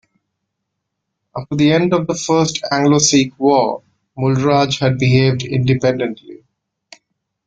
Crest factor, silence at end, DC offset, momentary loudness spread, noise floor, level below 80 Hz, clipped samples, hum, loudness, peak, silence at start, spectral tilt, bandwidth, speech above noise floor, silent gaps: 16 dB; 1.15 s; under 0.1%; 12 LU; -76 dBFS; -50 dBFS; under 0.1%; none; -15 LUFS; -2 dBFS; 1.35 s; -5 dB/octave; 9.2 kHz; 61 dB; none